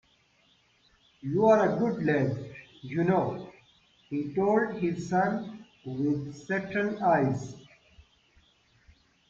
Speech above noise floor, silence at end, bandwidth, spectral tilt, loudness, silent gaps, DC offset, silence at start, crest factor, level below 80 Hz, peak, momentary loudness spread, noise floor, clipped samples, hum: 39 dB; 1.3 s; 7.8 kHz; -8 dB/octave; -28 LUFS; none; under 0.1%; 1.25 s; 20 dB; -64 dBFS; -10 dBFS; 18 LU; -66 dBFS; under 0.1%; none